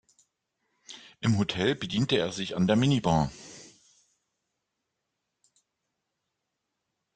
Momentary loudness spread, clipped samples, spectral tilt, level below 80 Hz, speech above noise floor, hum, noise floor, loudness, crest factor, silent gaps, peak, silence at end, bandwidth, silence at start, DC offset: 22 LU; under 0.1%; -6 dB/octave; -58 dBFS; 57 dB; none; -83 dBFS; -27 LUFS; 20 dB; none; -10 dBFS; 3.5 s; 9.4 kHz; 0.9 s; under 0.1%